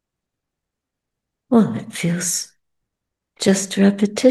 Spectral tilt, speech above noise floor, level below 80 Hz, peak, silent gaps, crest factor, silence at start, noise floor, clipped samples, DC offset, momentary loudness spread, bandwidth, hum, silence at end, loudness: -5 dB/octave; 65 dB; -66 dBFS; -2 dBFS; none; 20 dB; 1.5 s; -82 dBFS; under 0.1%; under 0.1%; 7 LU; 12.5 kHz; none; 0 s; -19 LUFS